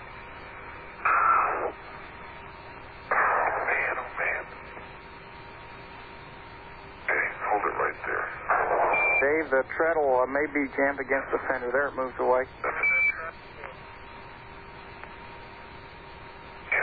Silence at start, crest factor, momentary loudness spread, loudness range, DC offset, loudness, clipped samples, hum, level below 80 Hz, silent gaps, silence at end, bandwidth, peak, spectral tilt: 0 s; 18 dB; 21 LU; 9 LU; under 0.1%; -26 LUFS; under 0.1%; none; -54 dBFS; none; 0 s; 4.9 kHz; -12 dBFS; -8.5 dB/octave